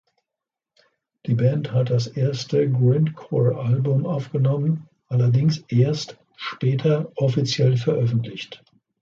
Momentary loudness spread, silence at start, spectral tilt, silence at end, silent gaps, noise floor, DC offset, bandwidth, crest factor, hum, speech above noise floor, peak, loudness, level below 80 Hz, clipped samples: 10 LU; 1.25 s; -7.5 dB/octave; 0.45 s; none; -86 dBFS; under 0.1%; 7.4 kHz; 16 dB; none; 66 dB; -6 dBFS; -22 LUFS; -60 dBFS; under 0.1%